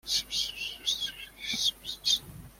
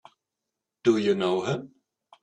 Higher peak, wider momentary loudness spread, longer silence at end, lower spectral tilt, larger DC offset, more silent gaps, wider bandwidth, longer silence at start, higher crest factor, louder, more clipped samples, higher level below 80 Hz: about the same, -12 dBFS vs -10 dBFS; about the same, 6 LU vs 8 LU; second, 0.05 s vs 0.55 s; second, 0.5 dB/octave vs -6 dB/octave; neither; neither; first, 16.5 kHz vs 9.2 kHz; second, 0.05 s vs 0.85 s; about the same, 22 dB vs 20 dB; second, -30 LUFS vs -26 LUFS; neither; first, -58 dBFS vs -68 dBFS